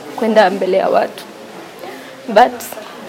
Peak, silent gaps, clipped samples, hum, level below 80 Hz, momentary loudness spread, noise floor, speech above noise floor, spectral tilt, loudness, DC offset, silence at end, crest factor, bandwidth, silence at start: 0 dBFS; none; under 0.1%; none; -60 dBFS; 20 LU; -33 dBFS; 20 dB; -4.5 dB/octave; -14 LUFS; under 0.1%; 0 s; 16 dB; 17 kHz; 0 s